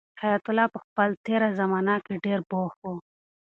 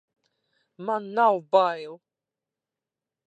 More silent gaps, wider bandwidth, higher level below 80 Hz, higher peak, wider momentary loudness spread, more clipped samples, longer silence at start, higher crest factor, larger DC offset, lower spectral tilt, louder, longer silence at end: first, 0.84-0.96 s, 1.17-1.24 s, 2.76-2.82 s vs none; second, 4.4 kHz vs 8.4 kHz; first, -70 dBFS vs -88 dBFS; about the same, -8 dBFS vs -6 dBFS; second, 9 LU vs 15 LU; neither; second, 0.15 s vs 0.8 s; about the same, 20 dB vs 22 dB; neither; first, -8.5 dB/octave vs -6 dB/octave; about the same, -26 LUFS vs -24 LUFS; second, 0.4 s vs 1.35 s